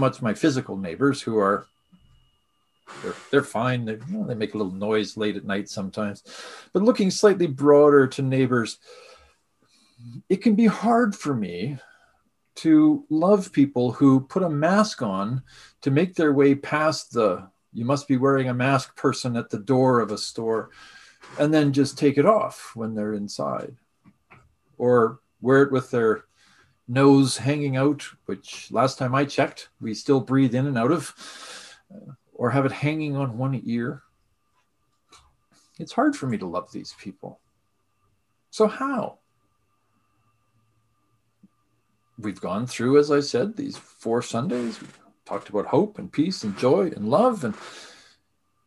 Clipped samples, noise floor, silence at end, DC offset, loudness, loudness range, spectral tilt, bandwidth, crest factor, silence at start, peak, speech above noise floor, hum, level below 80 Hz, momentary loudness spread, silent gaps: under 0.1%; -72 dBFS; 0.8 s; under 0.1%; -23 LUFS; 10 LU; -6.5 dB/octave; 12.5 kHz; 20 dB; 0 s; -4 dBFS; 50 dB; none; -64 dBFS; 16 LU; none